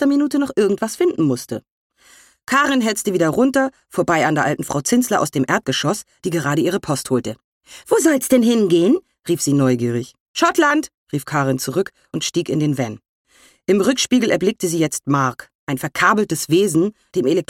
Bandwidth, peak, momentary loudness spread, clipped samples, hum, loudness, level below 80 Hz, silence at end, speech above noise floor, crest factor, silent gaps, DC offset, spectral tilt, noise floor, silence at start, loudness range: 17 kHz; -2 dBFS; 10 LU; under 0.1%; none; -18 LUFS; -58 dBFS; 0.05 s; 33 dB; 16 dB; 1.71-1.90 s, 7.44-7.61 s, 10.20-10.34 s, 10.94-11.07 s, 13.09-13.25 s, 15.55-15.67 s; under 0.1%; -4.5 dB/octave; -50 dBFS; 0 s; 3 LU